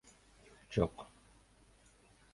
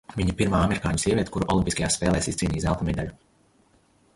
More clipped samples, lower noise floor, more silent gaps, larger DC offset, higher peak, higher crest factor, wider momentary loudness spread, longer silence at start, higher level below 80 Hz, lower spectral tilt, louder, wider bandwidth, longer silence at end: neither; first, -66 dBFS vs -62 dBFS; neither; neither; second, -16 dBFS vs -8 dBFS; first, 28 dB vs 18 dB; first, 26 LU vs 5 LU; first, 0.7 s vs 0.1 s; second, -58 dBFS vs -38 dBFS; first, -7 dB/octave vs -5 dB/octave; second, -37 LUFS vs -25 LUFS; about the same, 11.5 kHz vs 11.5 kHz; first, 1.3 s vs 1 s